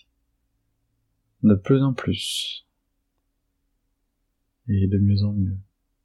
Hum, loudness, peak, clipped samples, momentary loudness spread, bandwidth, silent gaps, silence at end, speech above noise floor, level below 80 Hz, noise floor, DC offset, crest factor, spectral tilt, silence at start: none; -22 LUFS; -6 dBFS; under 0.1%; 13 LU; 12.5 kHz; none; 0.4 s; 53 dB; -58 dBFS; -74 dBFS; under 0.1%; 20 dB; -6.5 dB/octave; 1.45 s